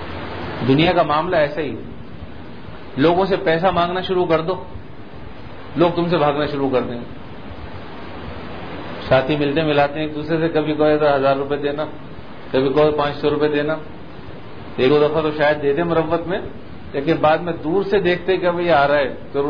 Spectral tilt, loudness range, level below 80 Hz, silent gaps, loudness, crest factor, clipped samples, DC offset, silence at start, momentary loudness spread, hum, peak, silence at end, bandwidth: -8.5 dB/octave; 4 LU; -44 dBFS; none; -18 LUFS; 18 dB; under 0.1%; 2%; 0 s; 20 LU; none; -2 dBFS; 0 s; 5.4 kHz